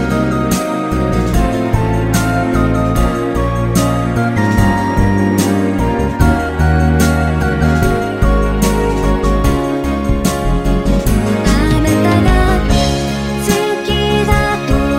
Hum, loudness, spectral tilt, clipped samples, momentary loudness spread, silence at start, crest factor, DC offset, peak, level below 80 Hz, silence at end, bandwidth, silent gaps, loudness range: none; -14 LUFS; -6 dB/octave; under 0.1%; 4 LU; 0 s; 12 dB; under 0.1%; 0 dBFS; -18 dBFS; 0 s; 16.5 kHz; none; 1 LU